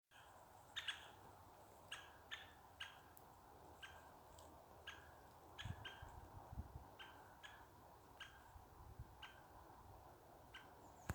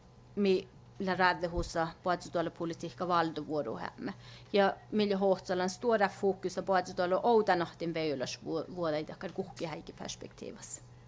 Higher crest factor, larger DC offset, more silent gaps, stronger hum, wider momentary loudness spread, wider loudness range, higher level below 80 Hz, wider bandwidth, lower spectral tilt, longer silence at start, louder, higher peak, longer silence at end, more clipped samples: first, 30 dB vs 20 dB; neither; neither; neither; second, 11 LU vs 14 LU; about the same, 6 LU vs 5 LU; second, -68 dBFS vs -56 dBFS; first, over 20 kHz vs 8 kHz; second, -3.5 dB/octave vs -5 dB/octave; second, 0.1 s vs 0.3 s; second, -58 LUFS vs -33 LUFS; second, -30 dBFS vs -12 dBFS; about the same, 0 s vs 0 s; neither